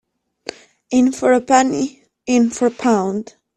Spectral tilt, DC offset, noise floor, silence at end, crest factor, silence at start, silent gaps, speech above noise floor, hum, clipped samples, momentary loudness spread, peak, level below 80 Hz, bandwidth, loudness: -4.5 dB/octave; under 0.1%; -36 dBFS; 0.35 s; 16 dB; 0.9 s; none; 20 dB; none; under 0.1%; 20 LU; -2 dBFS; -58 dBFS; 11 kHz; -17 LUFS